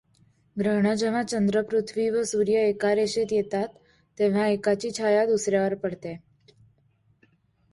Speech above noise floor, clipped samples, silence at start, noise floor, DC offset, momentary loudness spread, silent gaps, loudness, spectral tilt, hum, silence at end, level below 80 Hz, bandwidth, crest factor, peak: 41 dB; under 0.1%; 0.55 s; -65 dBFS; under 0.1%; 9 LU; none; -25 LUFS; -5 dB/octave; none; 1.55 s; -64 dBFS; 11.5 kHz; 14 dB; -10 dBFS